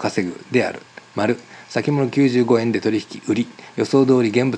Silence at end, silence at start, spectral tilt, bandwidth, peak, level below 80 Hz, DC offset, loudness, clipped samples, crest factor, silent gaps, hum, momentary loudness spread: 0 s; 0 s; -6.5 dB/octave; 10 kHz; -4 dBFS; -70 dBFS; under 0.1%; -20 LUFS; under 0.1%; 16 dB; none; none; 11 LU